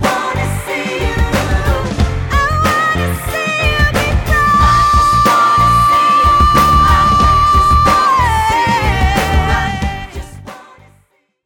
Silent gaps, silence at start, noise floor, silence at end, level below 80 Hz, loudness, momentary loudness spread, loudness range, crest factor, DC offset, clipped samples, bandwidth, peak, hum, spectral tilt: none; 0 s; -55 dBFS; 0.85 s; -20 dBFS; -12 LUFS; 9 LU; 6 LU; 12 dB; under 0.1%; under 0.1%; 18.5 kHz; 0 dBFS; none; -5 dB/octave